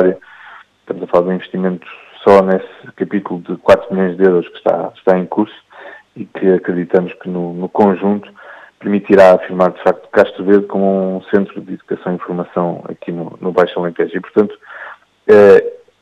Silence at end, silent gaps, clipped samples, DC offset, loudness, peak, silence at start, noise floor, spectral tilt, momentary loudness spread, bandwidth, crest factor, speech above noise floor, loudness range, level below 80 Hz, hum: 0.3 s; none; under 0.1%; under 0.1%; -14 LUFS; 0 dBFS; 0 s; -40 dBFS; -8 dB/octave; 17 LU; 8.8 kHz; 14 dB; 26 dB; 6 LU; -54 dBFS; none